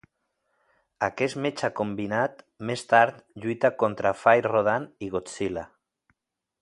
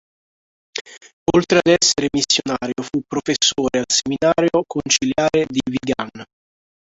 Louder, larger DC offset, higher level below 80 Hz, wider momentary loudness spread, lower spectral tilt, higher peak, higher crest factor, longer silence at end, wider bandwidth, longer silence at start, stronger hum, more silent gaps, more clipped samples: second, -25 LUFS vs -18 LUFS; neither; second, -62 dBFS vs -50 dBFS; about the same, 12 LU vs 11 LU; first, -5.5 dB/octave vs -3 dB/octave; second, -4 dBFS vs 0 dBFS; about the same, 22 dB vs 18 dB; first, 0.95 s vs 0.7 s; first, 11.5 kHz vs 8.2 kHz; first, 1 s vs 0.75 s; neither; second, none vs 0.81-0.85 s, 1.13-1.26 s; neither